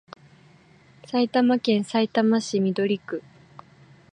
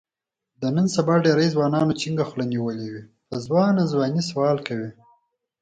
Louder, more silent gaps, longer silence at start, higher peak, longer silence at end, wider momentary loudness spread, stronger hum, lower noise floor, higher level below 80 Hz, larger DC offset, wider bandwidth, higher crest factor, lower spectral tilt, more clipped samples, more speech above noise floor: about the same, -23 LUFS vs -22 LUFS; neither; first, 1.1 s vs 0.6 s; second, -8 dBFS vs -4 dBFS; first, 0.95 s vs 0.7 s; second, 8 LU vs 14 LU; neither; second, -54 dBFS vs -87 dBFS; second, -72 dBFS vs -60 dBFS; neither; about the same, 10 kHz vs 9.2 kHz; about the same, 16 dB vs 18 dB; about the same, -5.5 dB/octave vs -6.5 dB/octave; neither; second, 32 dB vs 65 dB